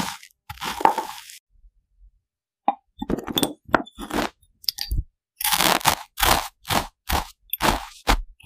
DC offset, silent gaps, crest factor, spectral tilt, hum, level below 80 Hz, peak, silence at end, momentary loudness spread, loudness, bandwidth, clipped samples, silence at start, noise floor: under 0.1%; 1.40-1.47 s; 26 dB; -2.5 dB/octave; none; -36 dBFS; 0 dBFS; 0.15 s; 13 LU; -24 LUFS; 16 kHz; under 0.1%; 0 s; -78 dBFS